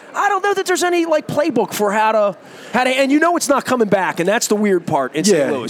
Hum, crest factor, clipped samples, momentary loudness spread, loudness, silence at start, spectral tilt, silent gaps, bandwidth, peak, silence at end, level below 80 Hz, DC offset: none; 14 dB; under 0.1%; 4 LU; -16 LUFS; 0.05 s; -4 dB/octave; none; 18 kHz; -2 dBFS; 0 s; -64 dBFS; under 0.1%